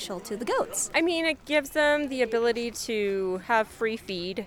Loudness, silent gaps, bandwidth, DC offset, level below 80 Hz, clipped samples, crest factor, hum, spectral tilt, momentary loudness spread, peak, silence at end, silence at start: -27 LUFS; none; 19 kHz; under 0.1%; -56 dBFS; under 0.1%; 18 dB; none; -3 dB/octave; 7 LU; -10 dBFS; 0 s; 0 s